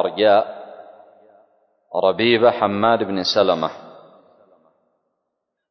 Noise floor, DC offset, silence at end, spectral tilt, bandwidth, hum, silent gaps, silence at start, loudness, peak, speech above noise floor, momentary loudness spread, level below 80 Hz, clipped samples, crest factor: -78 dBFS; under 0.1%; 1.8 s; -5 dB/octave; 6.4 kHz; none; none; 0 s; -18 LUFS; -2 dBFS; 60 dB; 17 LU; -60 dBFS; under 0.1%; 18 dB